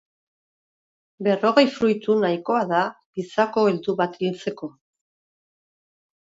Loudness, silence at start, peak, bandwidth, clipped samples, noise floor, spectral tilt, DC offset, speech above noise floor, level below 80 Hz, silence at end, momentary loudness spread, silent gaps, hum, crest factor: -22 LUFS; 1.2 s; -2 dBFS; 7.8 kHz; under 0.1%; under -90 dBFS; -6 dB/octave; under 0.1%; over 69 dB; -68 dBFS; 1.7 s; 13 LU; 3.06-3.13 s; none; 22 dB